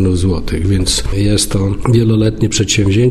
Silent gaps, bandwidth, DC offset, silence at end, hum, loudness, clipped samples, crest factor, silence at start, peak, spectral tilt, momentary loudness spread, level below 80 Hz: none; 13.5 kHz; under 0.1%; 0 s; none; -13 LUFS; under 0.1%; 12 dB; 0 s; 0 dBFS; -5 dB/octave; 4 LU; -24 dBFS